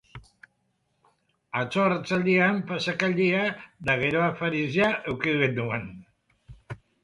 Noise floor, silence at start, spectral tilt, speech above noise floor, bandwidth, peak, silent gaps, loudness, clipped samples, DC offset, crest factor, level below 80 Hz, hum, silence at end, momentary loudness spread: -73 dBFS; 0.15 s; -6.5 dB/octave; 48 dB; 11 kHz; -8 dBFS; none; -25 LUFS; under 0.1%; under 0.1%; 20 dB; -58 dBFS; none; 0.3 s; 11 LU